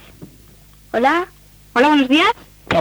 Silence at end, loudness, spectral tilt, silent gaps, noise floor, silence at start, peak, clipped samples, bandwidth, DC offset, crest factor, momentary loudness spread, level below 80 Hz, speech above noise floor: 0 s; -16 LUFS; -4.5 dB/octave; none; -46 dBFS; 0.2 s; -2 dBFS; under 0.1%; over 20 kHz; under 0.1%; 16 dB; 14 LU; -48 dBFS; 31 dB